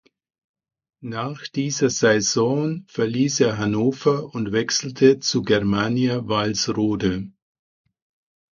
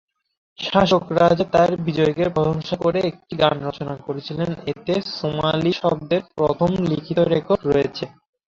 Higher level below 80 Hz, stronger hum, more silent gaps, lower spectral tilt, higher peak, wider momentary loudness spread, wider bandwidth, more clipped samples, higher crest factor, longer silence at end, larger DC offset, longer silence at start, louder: about the same, -52 dBFS vs -48 dBFS; neither; neither; second, -4.5 dB/octave vs -7 dB/octave; about the same, -2 dBFS vs -2 dBFS; about the same, 11 LU vs 11 LU; about the same, 7.4 kHz vs 7.6 kHz; neither; about the same, 20 dB vs 20 dB; first, 1.25 s vs 0.4 s; neither; first, 1 s vs 0.6 s; about the same, -21 LUFS vs -21 LUFS